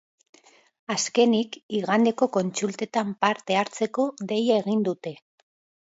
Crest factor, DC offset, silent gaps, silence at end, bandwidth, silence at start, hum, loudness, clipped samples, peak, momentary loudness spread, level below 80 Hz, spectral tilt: 18 dB; under 0.1%; 1.63-1.69 s; 0.7 s; 8 kHz; 0.9 s; none; -25 LUFS; under 0.1%; -6 dBFS; 8 LU; -74 dBFS; -4.5 dB/octave